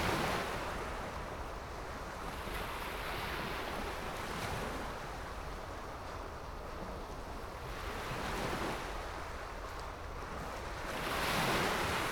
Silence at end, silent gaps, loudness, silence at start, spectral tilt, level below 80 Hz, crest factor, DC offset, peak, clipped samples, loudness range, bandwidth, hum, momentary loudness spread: 0 s; none; -39 LUFS; 0 s; -4 dB/octave; -48 dBFS; 18 dB; under 0.1%; -22 dBFS; under 0.1%; 5 LU; over 20 kHz; none; 11 LU